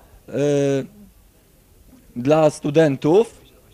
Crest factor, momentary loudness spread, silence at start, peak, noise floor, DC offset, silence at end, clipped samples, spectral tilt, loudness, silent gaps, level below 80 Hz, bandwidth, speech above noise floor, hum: 18 dB; 12 LU; 0.3 s; -2 dBFS; -53 dBFS; under 0.1%; 0.45 s; under 0.1%; -6.5 dB/octave; -19 LUFS; none; -54 dBFS; 15 kHz; 36 dB; none